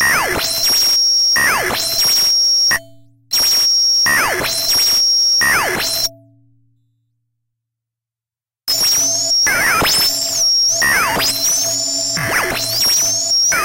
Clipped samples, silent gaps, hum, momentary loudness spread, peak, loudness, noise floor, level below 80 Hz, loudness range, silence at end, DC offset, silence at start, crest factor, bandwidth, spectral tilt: under 0.1%; none; none; 6 LU; -4 dBFS; -12 LUFS; under -90 dBFS; -44 dBFS; 7 LU; 0 s; under 0.1%; 0 s; 12 dB; 16.5 kHz; 0.5 dB/octave